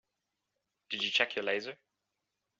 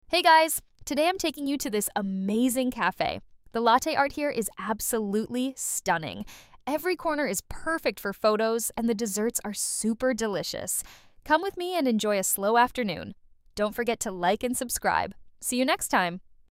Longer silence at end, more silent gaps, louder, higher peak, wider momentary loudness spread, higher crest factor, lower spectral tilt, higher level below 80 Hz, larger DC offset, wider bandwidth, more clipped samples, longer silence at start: first, 0.85 s vs 0.3 s; neither; second, -32 LUFS vs -27 LUFS; second, -12 dBFS vs -8 dBFS; about the same, 11 LU vs 9 LU; first, 26 dB vs 20 dB; second, 1 dB/octave vs -3 dB/octave; second, -86 dBFS vs -54 dBFS; neither; second, 7.6 kHz vs 16 kHz; neither; first, 0.9 s vs 0.1 s